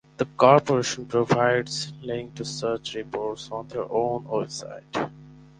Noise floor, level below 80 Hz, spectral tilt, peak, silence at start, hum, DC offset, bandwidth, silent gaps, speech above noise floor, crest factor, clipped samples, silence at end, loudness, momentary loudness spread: -47 dBFS; -60 dBFS; -5 dB/octave; -2 dBFS; 0.2 s; none; under 0.1%; 10 kHz; none; 23 dB; 24 dB; under 0.1%; 0.2 s; -25 LUFS; 14 LU